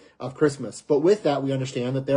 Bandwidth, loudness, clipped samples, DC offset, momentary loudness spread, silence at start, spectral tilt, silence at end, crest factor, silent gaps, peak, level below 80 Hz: 10.5 kHz; -23 LUFS; under 0.1%; under 0.1%; 9 LU; 0.2 s; -6.5 dB/octave; 0 s; 16 dB; none; -8 dBFS; -64 dBFS